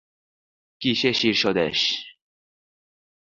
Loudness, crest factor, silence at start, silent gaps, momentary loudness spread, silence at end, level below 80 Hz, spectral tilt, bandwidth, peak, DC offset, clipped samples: -22 LUFS; 22 dB; 0.8 s; none; 7 LU; 1.2 s; -62 dBFS; -4 dB/octave; 7.6 kHz; -6 dBFS; under 0.1%; under 0.1%